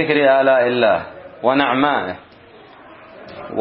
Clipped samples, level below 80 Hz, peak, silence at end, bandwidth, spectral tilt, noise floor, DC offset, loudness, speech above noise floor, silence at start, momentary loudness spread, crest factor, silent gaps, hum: under 0.1%; -60 dBFS; 0 dBFS; 0 s; 5.4 kHz; -10 dB/octave; -44 dBFS; under 0.1%; -16 LUFS; 28 dB; 0 s; 21 LU; 18 dB; none; none